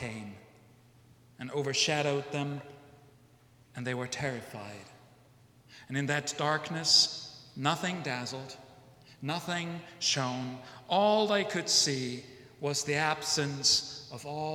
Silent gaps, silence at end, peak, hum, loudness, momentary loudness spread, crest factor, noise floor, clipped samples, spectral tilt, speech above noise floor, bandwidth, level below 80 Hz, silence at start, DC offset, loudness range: none; 0 s; -10 dBFS; none; -30 LUFS; 18 LU; 22 dB; -61 dBFS; under 0.1%; -3 dB/octave; 29 dB; 17 kHz; -72 dBFS; 0 s; under 0.1%; 9 LU